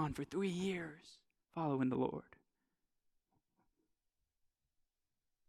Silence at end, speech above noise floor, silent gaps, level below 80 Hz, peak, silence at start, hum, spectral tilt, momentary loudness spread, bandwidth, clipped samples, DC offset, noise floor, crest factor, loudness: 3.25 s; 48 dB; none; -72 dBFS; -24 dBFS; 0 s; none; -6.5 dB/octave; 14 LU; 13.5 kHz; under 0.1%; under 0.1%; -88 dBFS; 20 dB; -40 LUFS